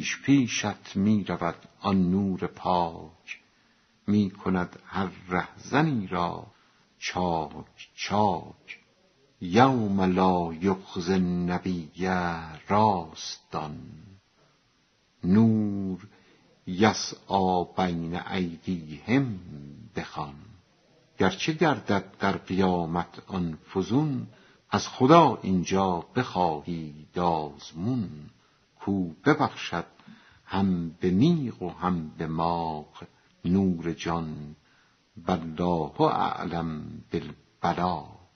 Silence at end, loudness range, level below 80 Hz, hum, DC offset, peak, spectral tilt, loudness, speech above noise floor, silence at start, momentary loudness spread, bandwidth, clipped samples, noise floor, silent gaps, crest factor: 0.25 s; 6 LU; -56 dBFS; none; under 0.1%; -4 dBFS; -5.5 dB/octave; -27 LUFS; 40 dB; 0 s; 15 LU; 6.4 kHz; under 0.1%; -67 dBFS; none; 24 dB